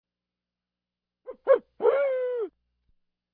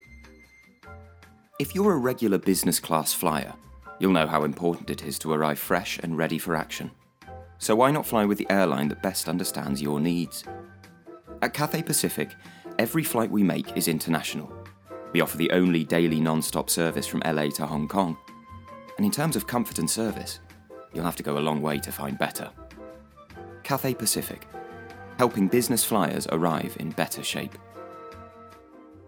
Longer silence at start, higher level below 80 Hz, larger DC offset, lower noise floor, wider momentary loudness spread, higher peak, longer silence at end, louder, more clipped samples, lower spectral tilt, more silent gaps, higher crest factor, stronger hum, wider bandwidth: first, 1.3 s vs 0.1 s; second, -76 dBFS vs -56 dBFS; neither; first, -89 dBFS vs -54 dBFS; second, 13 LU vs 20 LU; second, -8 dBFS vs -4 dBFS; first, 0.85 s vs 0 s; about the same, -26 LUFS vs -26 LUFS; neither; second, -2 dB/octave vs -4.5 dB/octave; neither; about the same, 20 dB vs 22 dB; first, 60 Hz at -80 dBFS vs none; second, 4.1 kHz vs over 20 kHz